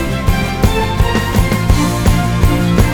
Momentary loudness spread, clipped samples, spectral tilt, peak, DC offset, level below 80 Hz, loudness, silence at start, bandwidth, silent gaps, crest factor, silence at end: 2 LU; under 0.1%; -6 dB/octave; 0 dBFS; 1%; -18 dBFS; -14 LUFS; 0 s; over 20 kHz; none; 12 dB; 0 s